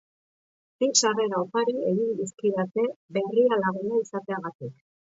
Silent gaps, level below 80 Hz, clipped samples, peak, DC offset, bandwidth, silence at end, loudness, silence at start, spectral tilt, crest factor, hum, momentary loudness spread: 2.96-3.09 s, 4.55-4.59 s; -76 dBFS; under 0.1%; -6 dBFS; under 0.1%; 8 kHz; 0.4 s; -26 LUFS; 0.8 s; -3.5 dB/octave; 20 dB; none; 11 LU